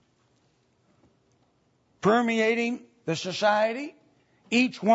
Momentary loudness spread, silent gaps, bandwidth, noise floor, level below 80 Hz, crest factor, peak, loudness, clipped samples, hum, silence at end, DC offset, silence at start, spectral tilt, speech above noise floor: 11 LU; none; 8 kHz; -68 dBFS; -74 dBFS; 18 dB; -8 dBFS; -25 LUFS; under 0.1%; none; 0 s; under 0.1%; 2.05 s; -5 dB/octave; 44 dB